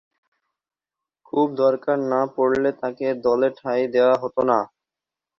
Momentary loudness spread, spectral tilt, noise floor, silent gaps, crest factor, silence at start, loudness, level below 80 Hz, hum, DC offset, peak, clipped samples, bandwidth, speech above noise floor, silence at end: 6 LU; -7.5 dB/octave; -88 dBFS; none; 18 dB; 1.35 s; -21 LUFS; -64 dBFS; none; under 0.1%; -6 dBFS; under 0.1%; 6.8 kHz; 68 dB; 0.75 s